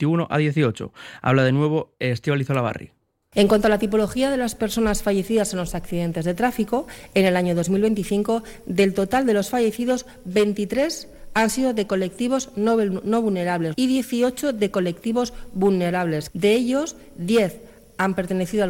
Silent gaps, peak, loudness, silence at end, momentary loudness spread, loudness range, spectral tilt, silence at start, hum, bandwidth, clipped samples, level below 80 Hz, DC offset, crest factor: none; -6 dBFS; -22 LUFS; 0 s; 7 LU; 1 LU; -5.5 dB/octave; 0 s; none; 17 kHz; under 0.1%; -44 dBFS; under 0.1%; 16 dB